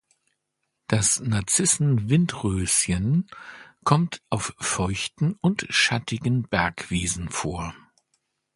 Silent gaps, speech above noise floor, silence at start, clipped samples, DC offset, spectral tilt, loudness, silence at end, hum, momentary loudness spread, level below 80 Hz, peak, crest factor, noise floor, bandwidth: none; 55 dB; 0.9 s; under 0.1%; under 0.1%; -4 dB/octave; -23 LUFS; 0.8 s; none; 9 LU; -46 dBFS; -2 dBFS; 24 dB; -79 dBFS; 12 kHz